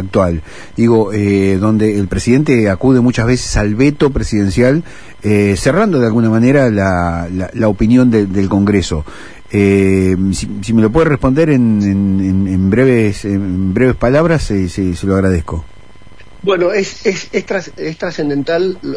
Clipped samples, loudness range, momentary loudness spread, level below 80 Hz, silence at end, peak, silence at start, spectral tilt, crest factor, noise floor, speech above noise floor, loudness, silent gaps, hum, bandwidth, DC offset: under 0.1%; 4 LU; 9 LU; -30 dBFS; 0 s; 0 dBFS; 0 s; -7 dB/octave; 12 dB; -41 dBFS; 29 dB; -13 LUFS; none; none; 11 kHz; 2%